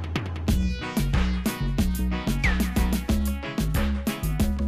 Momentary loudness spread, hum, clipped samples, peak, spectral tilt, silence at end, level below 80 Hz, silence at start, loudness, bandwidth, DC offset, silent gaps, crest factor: 4 LU; none; under 0.1%; -10 dBFS; -5.5 dB/octave; 0 s; -28 dBFS; 0 s; -26 LUFS; 15.5 kHz; under 0.1%; none; 14 dB